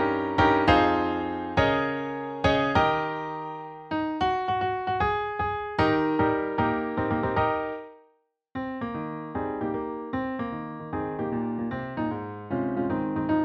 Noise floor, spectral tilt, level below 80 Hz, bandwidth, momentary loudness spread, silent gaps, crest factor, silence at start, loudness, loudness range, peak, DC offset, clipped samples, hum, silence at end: -67 dBFS; -7.5 dB/octave; -46 dBFS; 7.6 kHz; 11 LU; none; 20 dB; 0 s; -27 LUFS; 7 LU; -6 dBFS; under 0.1%; under 0.1%; none; 0 s